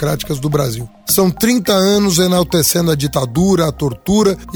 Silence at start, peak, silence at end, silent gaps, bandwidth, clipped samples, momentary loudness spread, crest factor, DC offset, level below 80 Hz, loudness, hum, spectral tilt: 0 s; 0 dBFS; 0 s; none; over 20 kHz; under 0.1%; 6 LU; 14 dB; under 0.1%; -36 dBFS; -14 LUFS; none; -4.5 dB/octave